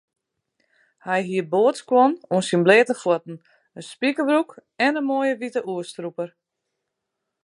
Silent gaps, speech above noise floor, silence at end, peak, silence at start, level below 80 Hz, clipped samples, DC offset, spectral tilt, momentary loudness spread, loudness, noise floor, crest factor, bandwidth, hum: none; 60 dB; 1.15 s; -2 dBFS; 1.05 s; -76 dBFS; under 0.1%; under 0.1%; -5.5 dB/octave; 17 LU; -21 LUFS; -81 dBFS; 20 dB; 11.5 kHz; none